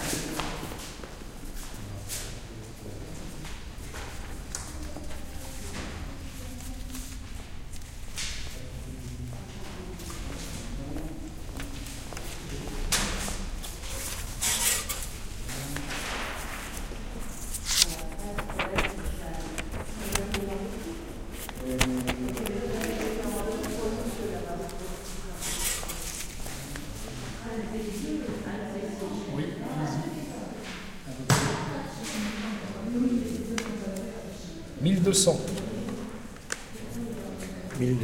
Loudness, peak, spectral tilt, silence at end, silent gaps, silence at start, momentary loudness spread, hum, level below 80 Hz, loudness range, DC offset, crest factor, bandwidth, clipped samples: -32 LUFS; -4 dBFS; -3.5 dB/octave; 0 s; none; 0 s; 14 LU; none; -40 dBFS; 10 LU; under 0.1%; 28 dB; 16.5 kHz; under 0.1%